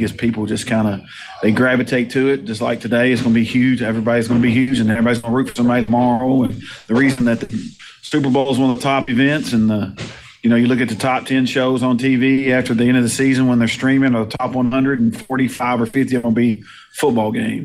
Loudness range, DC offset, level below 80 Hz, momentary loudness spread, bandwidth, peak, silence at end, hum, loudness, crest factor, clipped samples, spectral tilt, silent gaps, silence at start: 2 LU; under 0.1%; -48 dBFS; 7 LU; 14 kHz; -2 dBFS; 0 s; none; -16 LUFS; 14 dB; under 0.1%; -6 dB/octave; none; 0 s